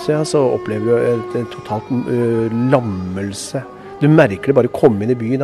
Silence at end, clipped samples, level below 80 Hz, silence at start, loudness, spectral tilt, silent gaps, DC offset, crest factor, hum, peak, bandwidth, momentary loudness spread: 0 s; under 0.1%; -52 dBFS; 0 s; -16 LUFS; -7 dB/octave; none; under 0.1%; 16 dB; none; 0 dBFS; 12.5 kHz; 11 LU